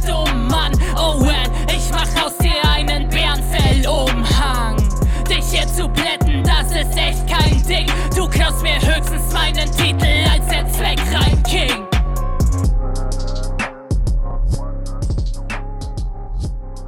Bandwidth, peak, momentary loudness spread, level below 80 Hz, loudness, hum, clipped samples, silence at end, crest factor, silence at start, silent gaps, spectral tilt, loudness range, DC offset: 17 kHz; -2 dBFS; 9 LU; -18 dBFS; -17 LUFS; none; under 0.1%; 0 s; 14 dB; 0 s; none; -4.5 dB/octave; 6 LU; under 0.1%